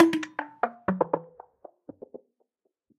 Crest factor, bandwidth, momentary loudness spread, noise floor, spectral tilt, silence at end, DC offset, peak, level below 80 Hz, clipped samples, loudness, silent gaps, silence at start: 24 dB; 12 kHz; 23 LU; -75 dBFS; -6.5 dB/octave; 1.75 s; under 0.1%; -6 dBFS; -66 dBFS; under 0.1%; -29 LUFS; none; 0 s